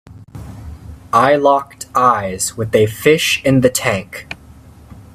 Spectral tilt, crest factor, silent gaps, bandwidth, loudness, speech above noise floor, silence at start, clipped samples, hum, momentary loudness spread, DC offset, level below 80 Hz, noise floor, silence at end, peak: -4 dB/octave; 16 dB; none; 16 kHz; -14 LUFS; 26 dB; 0.1 s; under 0.1%; none; 21 LU; under 0.1%; -44 dBFS; -40 dBFS; 0.1 s; 0 dBFS